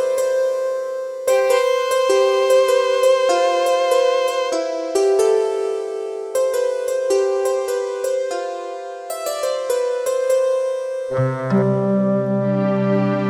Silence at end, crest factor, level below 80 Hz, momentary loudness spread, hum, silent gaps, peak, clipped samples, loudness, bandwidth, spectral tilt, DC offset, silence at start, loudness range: 0 s; 12 dB; -62 dBFS; 9 LU; none; none; -6 dBFS; under 0.1%; -19 LUFS; 16 kHz; -5.5 dB/octave; under 0.1%; 0 s; 5 LU